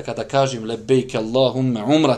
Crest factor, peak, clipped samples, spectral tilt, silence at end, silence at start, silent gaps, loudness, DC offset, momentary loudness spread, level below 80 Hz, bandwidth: 18 dB; -2 dBFS; under 0.1%; -6 dB/octave; 0 s; 0 s; none; -20 LUFS; under 0.1%; 4 LU; -52 dBFS; 11 kHz